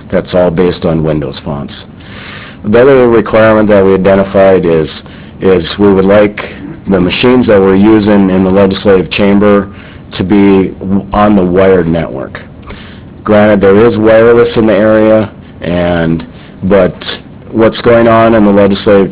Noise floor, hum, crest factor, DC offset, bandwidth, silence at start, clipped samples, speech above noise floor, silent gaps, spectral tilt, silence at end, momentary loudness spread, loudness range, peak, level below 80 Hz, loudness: -28 dBFS; none; 8 dB; under 0.1%; 4 kHz; 0 s; 3%; 21 dB; none; -11 dB/octave; 0 s; 17 LU; 3 LU; 0 dBFS; -30 dBFS; -7 LUFS